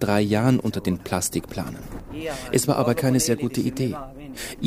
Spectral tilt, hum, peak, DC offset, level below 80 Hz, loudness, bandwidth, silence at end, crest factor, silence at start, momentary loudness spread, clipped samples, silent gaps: -5 dB/octave; none; -6 dBFS; under 0.1%; -46 dBFS; -24 LUFS; 16 kHz; 0 s; 18 dB; 0 s; 14 LU; under 0.1%; none